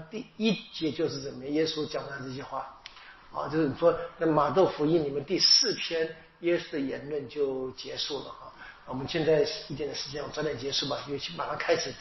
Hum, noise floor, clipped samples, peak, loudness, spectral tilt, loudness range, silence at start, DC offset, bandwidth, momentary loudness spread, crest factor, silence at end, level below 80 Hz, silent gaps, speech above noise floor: none; -49 dBFS; under 0.1%; -10 dBFS; -29 LUFS; -3 dB/octave; 7 LU; 0 s; under 0.1%; 6.2 kHz; 14 LU; 20 dB; 0 s; -60 dBFS; none; 20 dB